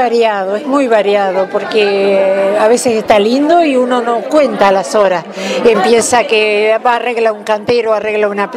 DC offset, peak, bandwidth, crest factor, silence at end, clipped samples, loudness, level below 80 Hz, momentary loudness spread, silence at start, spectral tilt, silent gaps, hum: under 0.1%; 0 dBFS; 15.5 kHz; 10 dB; 0 s; under 0.1%; -11 LUFS; -52 dBFS; 4 LU; 0 s; -3.5 dB/octave; none; none